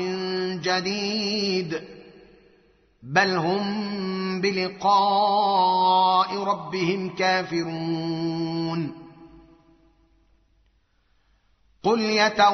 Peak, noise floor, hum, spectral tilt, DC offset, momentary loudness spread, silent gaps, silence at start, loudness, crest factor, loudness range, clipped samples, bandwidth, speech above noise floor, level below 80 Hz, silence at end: -6 dBFS; -65 dBFS; none; -3 dB/octave; under 0.1%; 9 LU; none; 0 s; -23 LUFS; 18 dB; 11 LU; under 0.1%; 6.4 kHz; 42 dB; -64 dBFS; 0 s